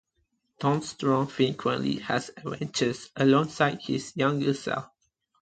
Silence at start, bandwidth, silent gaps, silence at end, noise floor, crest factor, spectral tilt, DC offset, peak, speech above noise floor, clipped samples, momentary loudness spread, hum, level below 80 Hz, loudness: 0.6 s; 9.2 kHz; none; 0.55 s; -75 dBFS; 20 dB; -5.5 dB/octave; under 0.1%; -8 dBFS; 48 dB; under 0.1%; 9 LU; none; -64 dBFS; -27 LUFS